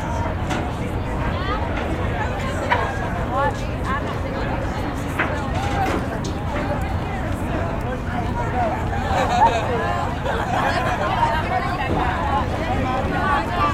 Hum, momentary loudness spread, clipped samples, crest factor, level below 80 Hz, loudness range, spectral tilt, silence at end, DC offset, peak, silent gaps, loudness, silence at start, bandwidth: none; 5 LU; under 0.1%; 18 dB; -30 dBFS; 3 LU; -6 dB/octave; 0 s; under 0.1%; -4 dBFS; none; -22 LUFS; 0 s; 15.5 kHz